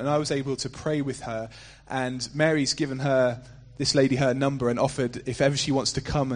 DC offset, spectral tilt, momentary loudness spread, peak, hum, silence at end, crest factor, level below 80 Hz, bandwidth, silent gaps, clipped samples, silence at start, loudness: under 0.1%; -5 dB/octave; 9 LU; -8 dBFS; none; 0 s; 18 dB; -48 dBFS; 10 kHz; none; under 0.1%; 0 s; -26 LUFS